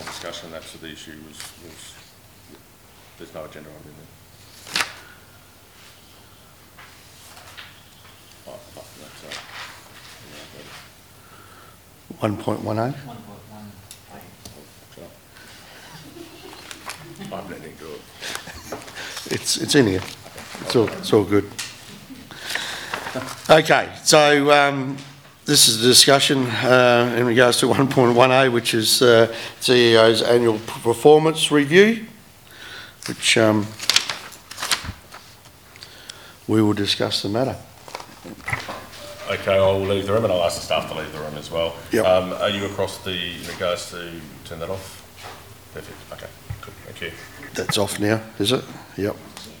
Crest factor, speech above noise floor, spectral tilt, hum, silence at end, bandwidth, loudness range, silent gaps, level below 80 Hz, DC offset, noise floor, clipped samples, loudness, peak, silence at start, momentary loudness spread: 22 dB; 29 dB; -3.5 dB/octave; none; 0.05 s; over 20 kHz; 24 LU; none; -56 dBFS; 0.1%; -49 dBFS; under 0.1%; -18 LUFS; 0 dBFS; 0 s; 26 LU